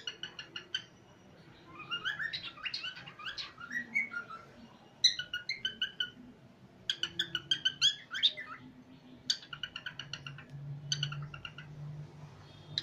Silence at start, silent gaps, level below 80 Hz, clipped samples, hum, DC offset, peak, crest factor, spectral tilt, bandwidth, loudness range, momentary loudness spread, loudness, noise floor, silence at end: 0 s; none; -70 dBFS; under 0.1%; none; under 0.1%; -14 dBFS; 26 dB; -1 dB/octave; 15.5 kHz; 7 LU; 21 LU; -35 LUFS; -58 dBFS; 0 s